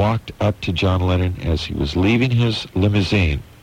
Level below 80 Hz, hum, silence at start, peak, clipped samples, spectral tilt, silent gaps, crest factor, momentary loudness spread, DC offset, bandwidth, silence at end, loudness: -32 dBFS; none; 0 s; -6 dBFS; under 0.1%; -7 dB/octave; none; 14 dB; 6 LU; under 0.1%; 9.8 kHz; 0.2 s; -19 LUFS